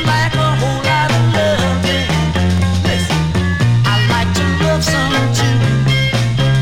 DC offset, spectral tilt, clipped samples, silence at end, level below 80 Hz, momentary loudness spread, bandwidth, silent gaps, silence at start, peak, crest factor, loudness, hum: under 0.1%; -5.5 dB/octave; under 0.1%; 0 s; -30 dBFS; 2 LU; 16 kHz; none; 0 s; -2 dBFS; 10 dB; -14 LUFS; none